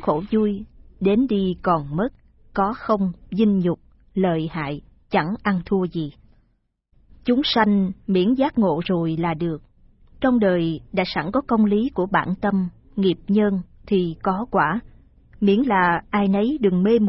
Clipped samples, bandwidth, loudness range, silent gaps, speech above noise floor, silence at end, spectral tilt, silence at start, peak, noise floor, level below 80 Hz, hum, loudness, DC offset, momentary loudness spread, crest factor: under 0.1%; 5.8 kHz; 2 LU; none; 46 dB; 0 s; -11 dB/octave; 0 s; -4 dBFS; -67 dBFS; -46 dBFS; none; -22 LUFS; under 0.1%; 10 LU; 16 dB